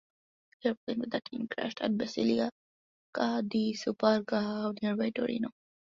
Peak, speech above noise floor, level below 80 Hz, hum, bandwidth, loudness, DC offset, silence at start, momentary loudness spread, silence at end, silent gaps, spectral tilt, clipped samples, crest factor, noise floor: -12 dBFS; over 59 dB; -72 dBFS; none; 7.6 kHz; -32 LUFS; under 0.1%; 0.65 s; 7 LU; 0.45 s; 0.77-0.87 s, 2.52-3.13 s; -6 dB/octave; under 0.1%; 22 dB; under -90 dBFS